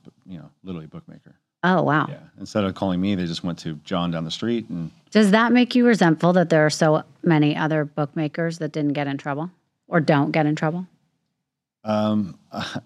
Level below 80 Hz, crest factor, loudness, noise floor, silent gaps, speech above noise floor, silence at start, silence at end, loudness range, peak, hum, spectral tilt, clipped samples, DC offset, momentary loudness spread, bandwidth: -64 dBFS; 20 dB; -21 LUFS; -82 dBFS; none; 61 dB; 0.3 s; 0.05 s; 6 LU; -2 dBFS; none; -6.5 dB/octave; under 0.1%; under 0.1%; 18 LU; 12 kHz